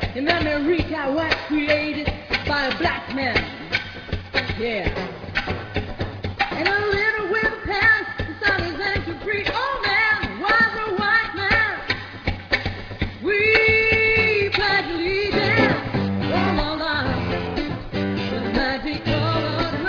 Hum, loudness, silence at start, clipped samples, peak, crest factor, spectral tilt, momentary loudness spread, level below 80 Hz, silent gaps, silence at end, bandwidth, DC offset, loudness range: none; -21 LUFS; 0 s; under 0.1%; -4 dBFS; 18 dB; -6 dB/octave; 10 LU; -38 dBFS; none; 0 s; 5.4 kHz; under 0.1%; 6 LU